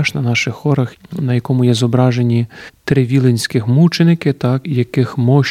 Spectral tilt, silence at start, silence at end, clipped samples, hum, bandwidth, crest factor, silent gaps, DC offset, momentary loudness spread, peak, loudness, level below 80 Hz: -6.5 dB/octave; 0 s; 0 s; under 0.1%; none; 14 kHz; 14 dB; none; under 0.1%; 6 LU; 0 dBFS; -15 LUFS; -52 dBFS